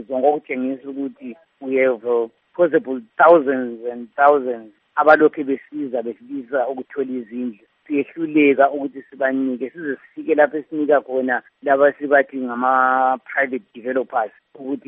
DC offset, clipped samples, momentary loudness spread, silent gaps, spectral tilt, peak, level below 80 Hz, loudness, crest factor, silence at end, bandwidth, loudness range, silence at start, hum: under 0.1%; under 0.1%; 14 LU; none; -4 dB/octave; 0 dBFS; -72 dBFS; -19 LUFS; 20 dB; 0.1 s; 5.2 kHz; 4 LU; 0 s; none